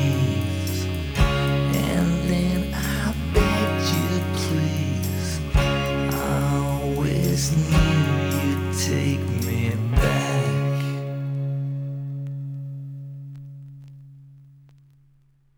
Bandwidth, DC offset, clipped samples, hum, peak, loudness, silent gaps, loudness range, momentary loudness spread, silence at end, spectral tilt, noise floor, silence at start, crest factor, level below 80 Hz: over 20 kHz; under 0.1%; under 0.1%; none; -4 dBFS; -23 LUFS; none; 10 LU; 12 LU; 1.15 s; -5.5 dB/octave; -58 dBFS; 0 s; 18 dB; -32 dBFS